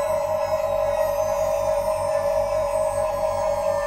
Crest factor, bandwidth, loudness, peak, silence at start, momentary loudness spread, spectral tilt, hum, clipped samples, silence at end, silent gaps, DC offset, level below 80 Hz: 12 dB; 16 kHz; -23 LUFS; -12 dBFS; 0 s; 1 LU; -4 dB/octave; none; under 0.1%; 0 s; none; under 0.1%; -44 dBFS